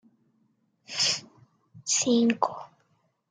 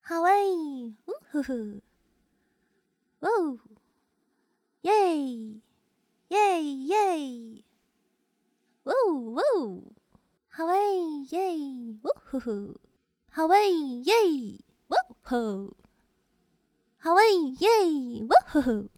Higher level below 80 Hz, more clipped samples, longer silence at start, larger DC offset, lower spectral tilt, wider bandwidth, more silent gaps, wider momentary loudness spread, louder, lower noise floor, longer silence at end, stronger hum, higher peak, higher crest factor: second, -76 dBFS vs -64 dBFS; neither; first, 0.9 s vs 0.05 s; neither; second, -2 dB/octave vs -4.5 dB/octave; second, 9.6 kHz vs 17.5 kHz; neither; second, 14 LU vs 17 LU; about the same, -26 LUFS vs -26 LUFS; second, -70 dBFS vs -74 dBFS; first, 0.65 s vs 0.1 s; neither; about the same, -8 dBFS vs -6 dBFS; about the same, 22 dB vs 22 dB